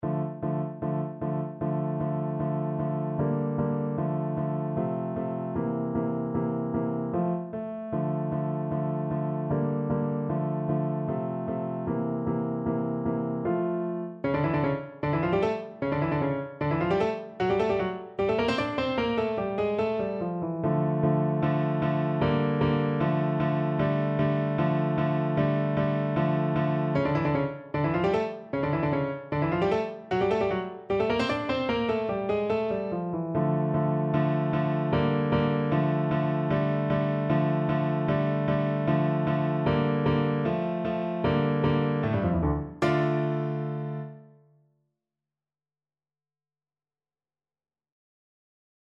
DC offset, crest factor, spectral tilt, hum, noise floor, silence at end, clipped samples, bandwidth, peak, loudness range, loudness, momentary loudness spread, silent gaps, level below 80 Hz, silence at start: under 0.1%; 16 dB; -9 dB/octave; none; under -90 dBFS; 4.6 s; under 0.1%; 6.8 kHz; -12 dBFS; 4 LU; -28 LUFS; 6 LU; none; -52 dBFS; 0 s